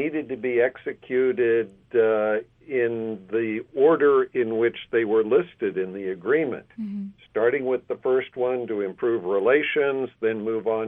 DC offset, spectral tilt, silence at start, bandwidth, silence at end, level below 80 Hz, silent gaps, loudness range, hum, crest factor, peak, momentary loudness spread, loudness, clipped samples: under 0.1%; -9 dB/octave; 0 s; 3.8 kHz; 0 s; -66 dBFS; none; 3 LU; none; 16 dB; -8 dBFS; 9 LU; -24 LUFS; under 0.1%